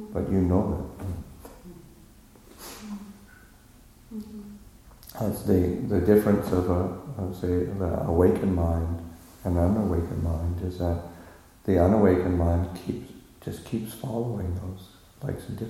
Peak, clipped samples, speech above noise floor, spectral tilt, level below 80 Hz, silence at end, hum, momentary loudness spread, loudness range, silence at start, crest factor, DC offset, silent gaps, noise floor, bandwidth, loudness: -6 dBFS; under 0.1%; 28 dB; -8.5 dB/octave; -40 dBFS; 0 s; none; 22 LU; 18 LU; 0 s; 20 dB; under 0.1%; none; -53 dBFS; 15.5 kHz; -26 LUFS